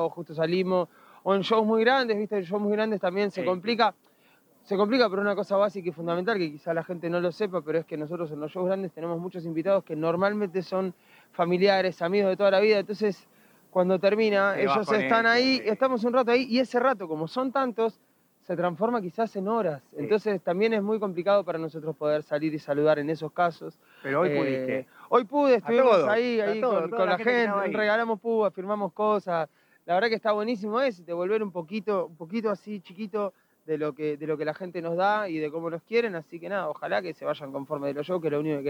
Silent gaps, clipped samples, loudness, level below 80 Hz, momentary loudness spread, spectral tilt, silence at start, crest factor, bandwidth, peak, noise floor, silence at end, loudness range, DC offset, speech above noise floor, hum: none; under 0.1%; -26 LUFS; -82 dBFS; 10 LU; -6.5 dB/octave; 0 s; 18 dB; 16 kHz; -8 dBFS; -62 dBFS; 0 s; 6 LU; under 0.1%; 36 dB; none